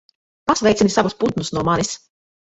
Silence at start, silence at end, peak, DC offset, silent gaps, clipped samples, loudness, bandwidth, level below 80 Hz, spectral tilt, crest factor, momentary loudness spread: 0.45 s; 0.55 s; -2 dBFS; under 0.1%; none; under 0.1%; -19 LUFS; 8.4 kHz; -48 dBFS; -4.5 dB/octave; 18 dB; 10 LU